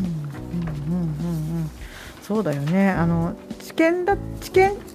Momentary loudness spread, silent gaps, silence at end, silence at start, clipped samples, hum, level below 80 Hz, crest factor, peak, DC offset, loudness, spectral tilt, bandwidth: 13 LU; none; 0 s; 0 s; under 0.1%; none; -40 dBFS; 18 dB; -6 dBFS; under 0.1%; -23 LUFS; -7 dB/octave; 15.5 kHz